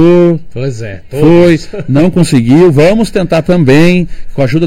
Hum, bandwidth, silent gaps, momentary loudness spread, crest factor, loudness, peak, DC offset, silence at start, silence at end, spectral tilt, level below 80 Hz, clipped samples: none; 14.5 kHz; none; 12 LU; 8 dB; -8 LUFS; 0 dBFS; under 0.1%; 0 s; 0 s; -7.5 dB/octave; -28 dBFS; 3%